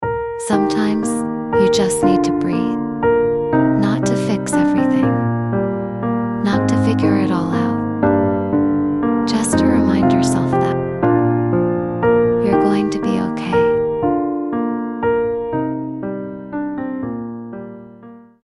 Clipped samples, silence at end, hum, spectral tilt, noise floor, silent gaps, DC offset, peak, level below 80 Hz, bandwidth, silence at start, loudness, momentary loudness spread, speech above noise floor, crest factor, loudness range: under 0.1%; 0.25 s; none; -6.5 dB/octave; -40 dBFS; none; under 0.1%; -2 dBFS; -44 dBFS; 12 kHz; 0 s; -17 LUFS; 9 LU; 24 dB; 14 dB; 5 LU